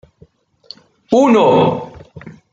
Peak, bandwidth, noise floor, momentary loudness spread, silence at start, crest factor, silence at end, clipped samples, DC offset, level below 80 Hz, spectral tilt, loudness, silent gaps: 0 dBFS; 7.8 kHz; -50 dBFS; 16 LU; 1.1 s; 16 dB; 0.2 s; under 0.1%; under 0.1%; -54 dBFS; -6.5 dB/octave; -13 LUFS; none